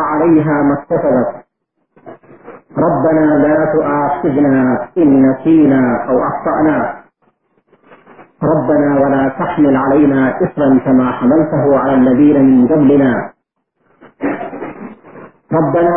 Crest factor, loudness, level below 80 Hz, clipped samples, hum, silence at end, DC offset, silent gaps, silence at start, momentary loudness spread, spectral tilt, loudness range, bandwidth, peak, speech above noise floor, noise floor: 12 dB; -12 LUFS; -48 dBFS; under 0.1%; none; 0 s; 0.6%; none; 0 s; 11 LU; -14 dB/octave; 5 LU; 3.4 kHz; 0 dBFS; 55 dB; -66 dBFS